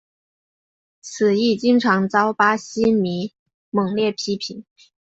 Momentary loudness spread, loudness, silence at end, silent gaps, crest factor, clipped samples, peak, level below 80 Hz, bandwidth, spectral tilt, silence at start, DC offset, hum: 15 LU; -19 LUFS; 0.45 s; 3.39-3.46 s, 3.54-3.72 s; 18 dB; under 0.1%; -2 dBFS; -60 dBFS; 8 kHz; -5 dB/octave; 1.05 s; under 0.1%; none